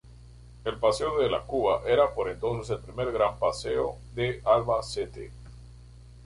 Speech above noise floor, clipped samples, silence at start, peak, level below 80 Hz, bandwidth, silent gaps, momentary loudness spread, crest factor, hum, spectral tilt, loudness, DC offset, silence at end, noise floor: 22 dB; under 0.1%; 0.05 s; -10 dBFS; -48 dBFS; 11.5 kHz; none; 12 LU; 20 dB; 60 Hz at -45 dBFS; -5.5 dB/octave; -28 LUFS; under 0.1%; 0 s; -49 dBFS